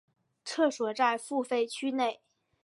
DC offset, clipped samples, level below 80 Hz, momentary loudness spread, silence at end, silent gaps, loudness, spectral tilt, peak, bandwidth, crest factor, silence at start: under 0.1%; under 0.1%; -88 dBFS; 10 LU; 0.5 s; none; -30 LUFS; -2.5 dB/octave; -14 dBFS; 11.5 kHz; 18 dB; 0.45 s